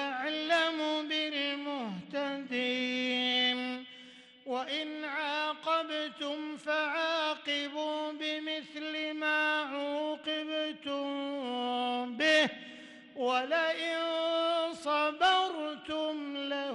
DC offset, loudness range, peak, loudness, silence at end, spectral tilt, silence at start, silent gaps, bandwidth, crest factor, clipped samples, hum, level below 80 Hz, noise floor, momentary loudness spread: under 0.1%; 3 LU; -18 dBFS; -32 LUFS; 0 s; -3 dB/octave; 0 s; none; 11.5 kHz; 16 dB; under 0.1%; none; -78 dBFS; -54 dBFS; 10 LU